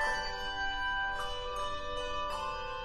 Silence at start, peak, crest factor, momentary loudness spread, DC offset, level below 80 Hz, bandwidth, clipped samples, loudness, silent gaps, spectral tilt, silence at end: 0 s; -22 dBFS; 14 dB; 4 LU; under 0.1%; -46 dBFS; 13 kHz; under 0.1%; -35 LUFS; none; -2 dB/octave; 0 s